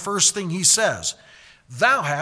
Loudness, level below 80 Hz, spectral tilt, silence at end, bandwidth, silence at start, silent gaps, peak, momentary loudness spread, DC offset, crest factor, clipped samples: -18 LUFS; -60 dBFS; -1.5 dB/octave; 0 s; 11 kHz; 0 s; none; -2 dBFS; 9 LU; under 0.1%; 18 dB; under 0.1%